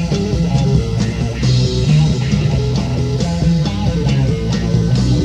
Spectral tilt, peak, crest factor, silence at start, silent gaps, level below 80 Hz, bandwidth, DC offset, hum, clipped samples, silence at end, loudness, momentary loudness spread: -7 dB/octave; -2 dBFS; 12 dB; 0 s; none; -24 dBFS; 9.4 kHz; under 0.1%; none; under 0.1%; 0 s; -16 LUFS; 4 LU